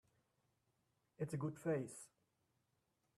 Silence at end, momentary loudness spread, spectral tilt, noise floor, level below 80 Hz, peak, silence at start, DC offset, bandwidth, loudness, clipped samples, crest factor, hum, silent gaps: 1.1 s; 15 LU; -7 dB/octave; -85 dBFS; -84 dBFS; -30 dBFS; 1.2 s; under 0.1%; 14 kHz; -45 LUFS; under 0.1%; 20 dB; none; none